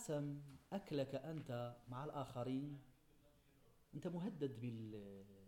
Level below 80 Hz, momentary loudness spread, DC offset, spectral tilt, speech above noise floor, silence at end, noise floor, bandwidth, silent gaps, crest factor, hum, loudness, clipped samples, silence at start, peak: -74 dBFS; 9 LU; under 0.1%; -7 dB/octave; 24 dB; 0 s; -72 dBFS; 18 kHz; none; 16 dB; none; -48 LUFS; under 0.1%; 0 s; -32 dBFS